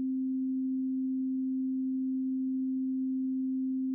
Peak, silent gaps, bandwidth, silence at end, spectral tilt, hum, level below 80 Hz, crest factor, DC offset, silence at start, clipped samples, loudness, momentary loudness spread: -28 dBFS; none; 0.4 kHz; 0 s; -3.5 dB/octave; none; under -90 dBFS; 4 dB; under 0.1%; 0 s; under 0.1%; -32 LUFS; 0 LU